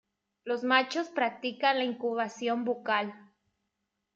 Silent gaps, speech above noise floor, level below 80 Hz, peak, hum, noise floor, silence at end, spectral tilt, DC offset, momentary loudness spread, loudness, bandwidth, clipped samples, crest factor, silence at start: none; 54 dB; -84 dBFS; -10 dBFS; none; -83 dBFS; 0.95 s; -3.5 dB/octave; under 0.1%; 8 LU; -30 LUFS; 7.8 kHz; under 0.1%; 22 dB; 0.45 s